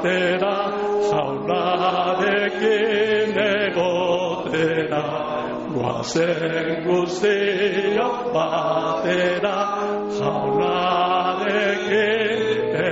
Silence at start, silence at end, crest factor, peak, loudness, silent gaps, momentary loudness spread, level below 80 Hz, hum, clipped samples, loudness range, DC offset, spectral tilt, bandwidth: 0 s; 0 s; 12 dB; -8 dBFS; -21 LUFS; none; 4 LU; -56 dBFS; none; under 0.1%; 2 LU; under 0.1%; -3 dB/octave; 8 kHz